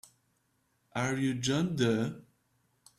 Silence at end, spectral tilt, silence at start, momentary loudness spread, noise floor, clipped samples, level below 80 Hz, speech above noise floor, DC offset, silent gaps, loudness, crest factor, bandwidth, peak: 0.75 s; -5 dB/octave; 0.95 s; 10 LU; -75 dBFS; under 0.1%; -66 dBFS; 45 dB; under 0.1%; none; -31 LUFS; 18 dB; 14 kHz; -14 dBFS